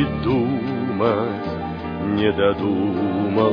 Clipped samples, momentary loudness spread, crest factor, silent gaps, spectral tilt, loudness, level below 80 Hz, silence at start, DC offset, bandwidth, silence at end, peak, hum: under 0.1%; 8 LU; 16 dB; none; -9.5 dB/octave; -21 LUFS; -44 dBFS; 0 s; under 0.1%; 5.2 kHz; 0 s; -4 dBFS; none